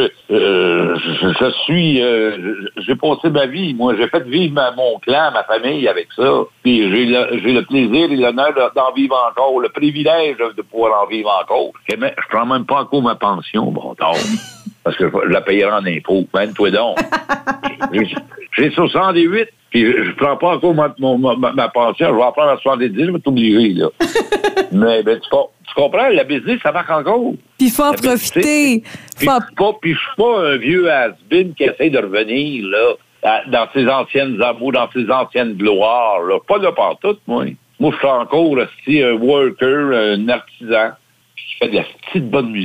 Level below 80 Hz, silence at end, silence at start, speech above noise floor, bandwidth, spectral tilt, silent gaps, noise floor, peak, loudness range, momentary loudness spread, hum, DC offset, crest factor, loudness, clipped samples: -54 dBFS; 0 s; 0 s; 21 dB; 16 kHz; -5 dB/octave; none; -36 dBFS; -4 dBFS; 2 LU; 6 LU; none; under 0.1%; 12 dB; -15 LUFS; under 0.1%